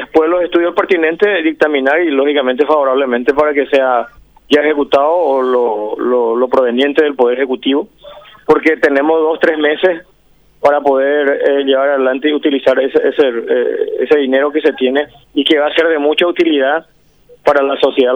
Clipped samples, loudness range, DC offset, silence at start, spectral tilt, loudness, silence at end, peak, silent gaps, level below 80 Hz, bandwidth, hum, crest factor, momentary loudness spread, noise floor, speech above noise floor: under 0.1%; 1 LU; 0.2%; 0 s; -5 dB/octave; -13 LUFS; 0 s; 0 dBFS; none; -52 dBFS; 7.6 kHz; none; 12 dB; 4 LU; -50 dBFS; 38 dB